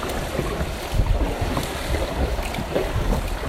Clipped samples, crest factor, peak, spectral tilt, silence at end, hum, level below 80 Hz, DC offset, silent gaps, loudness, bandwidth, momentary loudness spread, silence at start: under 0.1%; 16 dB; -8 dBFS; -5.5 dB/octave; 0 s; none; -26 dBFS; under 0.1%; none; -25 LUFS; 16 kHz; 2 LU; 0 s